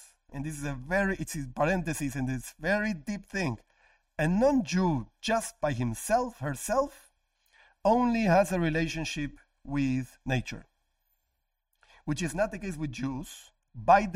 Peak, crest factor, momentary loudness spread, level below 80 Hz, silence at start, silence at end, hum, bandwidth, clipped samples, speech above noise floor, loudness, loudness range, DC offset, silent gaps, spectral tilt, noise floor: -10 dBFS; 20 dB; 14 LU; -48 dBFS; 0 s; 0 s; none; 16 kHz; under 0.1%; 51 dB; -30 LUFS; 7 LU; under 0.1%; none; -5.5 dB/octave; -80 dBFS